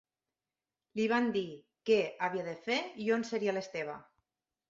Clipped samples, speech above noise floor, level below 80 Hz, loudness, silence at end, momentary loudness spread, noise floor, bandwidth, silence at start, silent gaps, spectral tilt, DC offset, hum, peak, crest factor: under 0.1%; over 57 dB; -78 dBFS; -34 LUFS; 0.65 s; 12 LU; under -90 dBFS; 7.8 kHz; 0.95 s; none; -5 dB/octave; under 0.1%; none; -16 dBFS; 20 dB